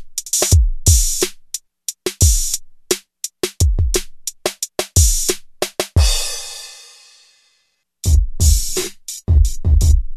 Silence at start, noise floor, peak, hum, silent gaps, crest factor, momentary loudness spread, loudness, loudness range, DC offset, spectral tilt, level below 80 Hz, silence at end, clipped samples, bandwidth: 0 s; -65 dBFS; 0 dBFS; none; none; 16 dB; 14 LU; -17 LUFS; 3 LU; under 0.1%; -3.5 dB/octave; -20 dBFS; 0 s; under 0.1%; 14 kHz